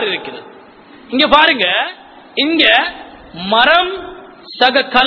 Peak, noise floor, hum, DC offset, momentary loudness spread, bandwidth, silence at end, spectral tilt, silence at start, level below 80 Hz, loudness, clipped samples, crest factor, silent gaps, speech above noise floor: 0 dBFS; -40 dBFS; none; under 0.1%; 23 LU; 5.4 kHz; 0 s; -5 dB/octave; 0 s; -46 dBFS; -12 LUFS; 0.2%; 14 dB; none; 27 dB